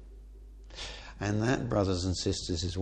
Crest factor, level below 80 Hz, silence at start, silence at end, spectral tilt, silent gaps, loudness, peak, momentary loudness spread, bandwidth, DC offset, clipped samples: 18 dB; -46 dBFS; 0 s; 0 s; -5 dB/octave; none; -32 LUFS; -14 dBFS; 18 LU; 9.8 kHz; under 0.1%; under 0.1%